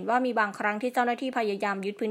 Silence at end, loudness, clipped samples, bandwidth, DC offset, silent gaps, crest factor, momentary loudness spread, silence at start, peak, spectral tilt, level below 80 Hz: 0 s; -28 LUFS; under 0.1%; 16 kHz; under 0.1%; none; 18 dB; 4 LU; 0 s; -10 dBFS; -5 dB/octave; -84 dBFS